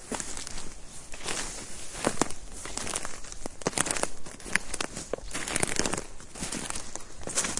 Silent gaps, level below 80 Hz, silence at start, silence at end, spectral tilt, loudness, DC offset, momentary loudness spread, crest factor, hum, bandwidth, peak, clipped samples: none; -46 dBFS; 0 s; 0 s; -2 dB/octave; -32 LUFS; under 0.1%; 13 LU; 30 dB; none; 11.5 kHz; -2 dBFS; under 0.1%